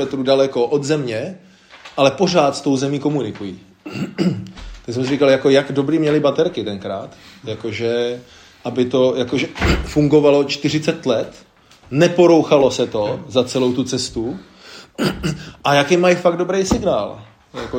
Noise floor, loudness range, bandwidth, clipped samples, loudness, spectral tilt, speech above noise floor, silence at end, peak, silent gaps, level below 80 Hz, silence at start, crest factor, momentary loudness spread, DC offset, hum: -40 dBFS; 4 LU; 16 kHz; under 0.1%; -17 LUFS; -5.5 dB/octave; 23 dB; 0 s; 0 dBFS; none; -40 dBFS; 0 s; 18 dB; 17 LU; under 0.1%; none